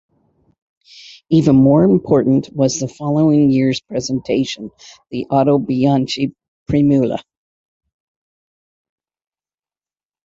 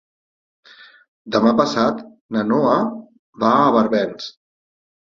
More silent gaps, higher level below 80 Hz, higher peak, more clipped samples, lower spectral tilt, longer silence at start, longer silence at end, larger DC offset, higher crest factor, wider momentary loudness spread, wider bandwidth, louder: about the same, 6.48-6.66 s vs 2.21-2.29 s, 3.19-3.33 s; first, -48 dBFS vs -60 dBFS; about the same, -2 dBFS vs -2 dBFS; neither; about the same, -7 dB/octave vs -6 dB/octave; about the same, 1.3 s vs 1.25 s; first, 3.05 s vs 0.75 s; neither; about the same, 16 dB vs 18 dB; second, 12 LU vs 16 LU; about the same, 7.6 kHz vs 7.2 kHz; first, -15 LUFS vs -18 LUFS